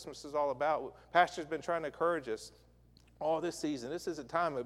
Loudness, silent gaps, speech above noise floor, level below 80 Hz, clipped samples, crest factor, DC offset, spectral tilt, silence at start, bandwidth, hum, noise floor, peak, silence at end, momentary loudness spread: -35 LUFS; none; 28 dB; -66 dBFS; under 0.1%; 22 dB; under 0.1%; -4.5 dB/octave; 0 s; 14 kHz; none; -63 dBFS; -12 dBFS; 0 s; 10 LU